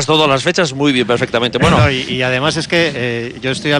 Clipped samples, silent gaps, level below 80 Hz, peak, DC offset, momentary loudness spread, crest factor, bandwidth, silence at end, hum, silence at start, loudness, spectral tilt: under 0.1%; none; -38 dBFS; 0 dBFS; under 0.1%; 8 LU; 14 dB; 12.5 kHz; 0 s; none; 0 s; -14 LUFS; -4.5 dB/octave